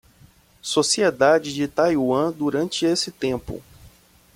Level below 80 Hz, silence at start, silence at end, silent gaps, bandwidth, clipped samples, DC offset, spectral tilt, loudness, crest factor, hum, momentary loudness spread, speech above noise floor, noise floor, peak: -52 dBFS; 0.65 s; 0.5 s; none; 16.5 kHz; under 0.1%; under 0.1%; -3.5 dB/octave; -21 LUFS; 18 dB; none; 12 LU; 33 dB; -53 dBFS; -4 dBFS